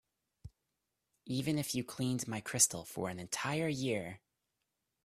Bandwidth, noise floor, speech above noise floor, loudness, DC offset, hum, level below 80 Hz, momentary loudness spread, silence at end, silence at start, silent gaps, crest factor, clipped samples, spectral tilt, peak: 15.5 kHz; -86 dBFS; 50 dB; -35 LUFS; under 0.1%; none; -68 dBFS; 11 LU; 0.85 s; 0.45 s; none; 26 dB; under 0.1%; -3.5 dB/octave; -14 dBFS